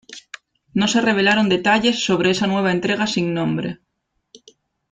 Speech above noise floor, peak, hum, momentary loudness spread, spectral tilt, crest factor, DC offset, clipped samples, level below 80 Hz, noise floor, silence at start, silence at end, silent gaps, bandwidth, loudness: 55 dB; -4 dBFS; none; 17 LU; -4.5 dB/octave; 16 dB; under 0.1%; under 0.1%; -56 dBFS; -73 dBFS; 0.1 s; 1.15 s; none; 9.4 kHz; -18 LUFS